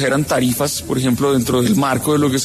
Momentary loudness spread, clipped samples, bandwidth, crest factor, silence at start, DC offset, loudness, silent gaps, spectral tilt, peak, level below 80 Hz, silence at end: 3 LU; under 0.1%; 14 kHz; 12 dB; 0 s; under 0.1%; -16 LUFS; none; -5 dB/octave; -4 dBFS; -44 dBFS; 0 s